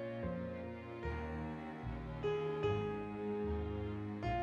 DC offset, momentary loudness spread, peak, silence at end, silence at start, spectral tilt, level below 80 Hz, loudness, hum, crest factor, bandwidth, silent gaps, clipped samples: under 0.1%; 8 LU; -24 dBFS; 0 s; 0 s; -8.5 dB/octave; -52 dBFS; -41 LUFS; none; 16 dB; 7.6 kHz; none; under 0.1%